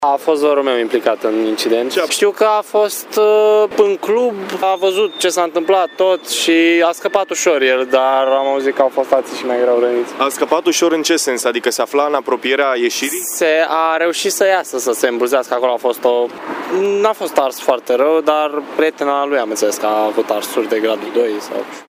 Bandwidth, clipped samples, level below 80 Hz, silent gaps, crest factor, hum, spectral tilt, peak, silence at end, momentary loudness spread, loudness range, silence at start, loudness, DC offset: 16 kHz; under 0.1%; -70 dBFS; none; 14 dB; none; -2 dB/octave; 0 dBFS; 0.05 s; 5 LU; 2 LU; 0 s; -15 LUFS; under 0.1%